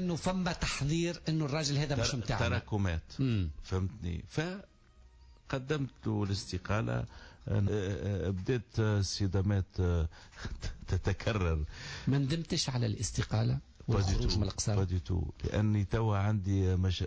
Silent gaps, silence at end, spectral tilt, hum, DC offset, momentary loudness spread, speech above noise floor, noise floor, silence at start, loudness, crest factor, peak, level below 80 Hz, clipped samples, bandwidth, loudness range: none; 0 s; -5.5 dB/octave; none; under 0.1%; 7 LU; 27 dB; -59 dBFS; 0 s; -33 LUFS; 12 dB; -20 dBFS; -42 dBFS; under 0.1%; 8 kHz; 5 LU